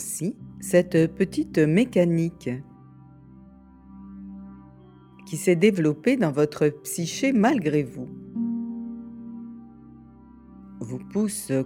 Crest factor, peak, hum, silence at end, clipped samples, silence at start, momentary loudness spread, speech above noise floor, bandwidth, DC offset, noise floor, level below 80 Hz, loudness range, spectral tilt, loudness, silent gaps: 20 dB; -6 dBFS; none; 0 s; under 0.1%; 0 s; 21 LU; 27 dB; 17 kHz; under 0.1%; -49 dBFS; -58 dBFS; 11 LU; -6 dB/octave; -24 LUFS; none